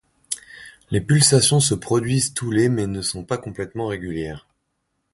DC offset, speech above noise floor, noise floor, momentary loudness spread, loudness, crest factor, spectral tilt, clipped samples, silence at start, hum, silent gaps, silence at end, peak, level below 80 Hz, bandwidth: under 0.1%; 53 dB; -74 dBFS; 16 LU; -20 LUFS; 20 dB; -4.5 dB/octave; under 0.1%; 0.3 s; none; none; 0.75 s; -2 dBFS; -48 dBFS; 12 kHz